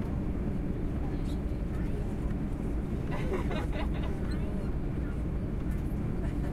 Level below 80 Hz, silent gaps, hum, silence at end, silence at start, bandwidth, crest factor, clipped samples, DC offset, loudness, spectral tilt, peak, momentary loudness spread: -34 dBFS; none; none; 0 s; 0 s; 12.5 kHz; 12 dB; under 0.1%; under 0.1%; -34 LUFS; -8.5 dB/octave; -18 dBFS; 2 LU